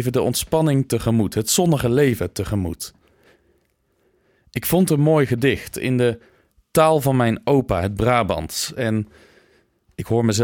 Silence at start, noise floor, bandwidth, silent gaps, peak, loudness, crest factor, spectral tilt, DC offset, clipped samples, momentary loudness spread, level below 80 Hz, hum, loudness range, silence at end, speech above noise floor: 0 s; -65 dBFS; 19 kHz; none; -4 dBFS; -20 LUFS; 16 dB; -5.5 dB/octave; under 0.1%; under 0.1%; 10 LU; -44 dBFS; none; 4 LU; 0 s; 46 dB